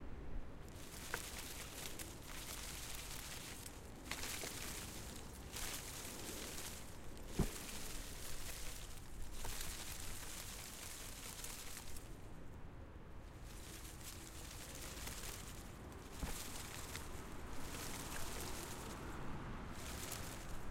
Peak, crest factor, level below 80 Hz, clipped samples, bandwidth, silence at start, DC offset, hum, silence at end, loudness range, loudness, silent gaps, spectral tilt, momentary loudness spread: -24 dBFS; 24 dB; -54 dBFS; under 0.1%; 16.5 kHz; 0 s; under 0.1%; none; 0 s; 4 LU; -49 LUFS; none; -3 dB/octave; 9 LU